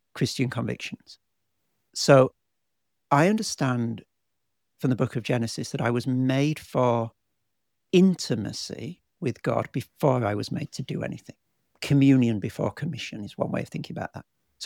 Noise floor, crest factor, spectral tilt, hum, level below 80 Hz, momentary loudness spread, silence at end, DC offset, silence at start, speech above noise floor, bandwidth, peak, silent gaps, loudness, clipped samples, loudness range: -82 dBFS; 22 dB; -6 dB/octave; none; -62 dBFS; 16 LU; 0 s; under 0.1%; 0.15 s; 58 dB; 16.5 kHz; -4 dBFS; none; -25 LUFS; under 0.1%; 3 LU